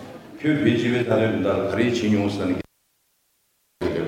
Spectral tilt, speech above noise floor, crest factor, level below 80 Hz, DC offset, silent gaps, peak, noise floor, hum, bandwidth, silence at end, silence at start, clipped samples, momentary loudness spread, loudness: -6.5 dB/octave; 47 dB; 18 dB; -54 dBFS; under 0.1%; none; -6 dBFS; -68 dBFS; none; 16 kHz; 0 s; 0 s; under 0.1%; 10 LU; -22 LUFS